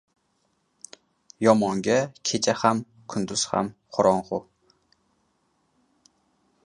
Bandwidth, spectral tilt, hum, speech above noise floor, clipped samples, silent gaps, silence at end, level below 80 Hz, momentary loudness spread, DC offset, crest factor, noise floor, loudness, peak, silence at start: 11 kHz; -4 dB/octave; none; 48 dB; under 0.1%; none; 2.25 s; -64 dBFS; 13 LU; under 0.1%; 24 dB; -71 dBFS; -24 LUFS; -2 dBFS; 1.4 s